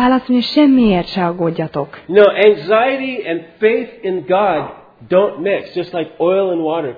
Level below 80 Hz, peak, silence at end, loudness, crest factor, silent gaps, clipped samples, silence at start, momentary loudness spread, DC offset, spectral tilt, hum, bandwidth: -46 dBFS; 0 dBFS; 0 s; -15 LUFS; 14 dB; none; under 0.1%; 0 s; 11 LU; under 0.1%; -8 dB/octave; none; 5 kHz